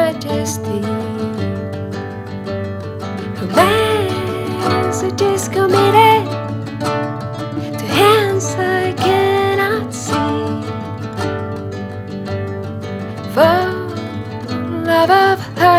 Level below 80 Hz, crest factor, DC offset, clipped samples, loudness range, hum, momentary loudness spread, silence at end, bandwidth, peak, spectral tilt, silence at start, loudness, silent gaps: -50 dBFS; 16 dB; under 0.1%; under 0.1%; 7 LU; none; 14 LU; 0 s; 16.5 kHz; 0 dBFS; -5 dB/octave; 0 s; -17 LUFS; none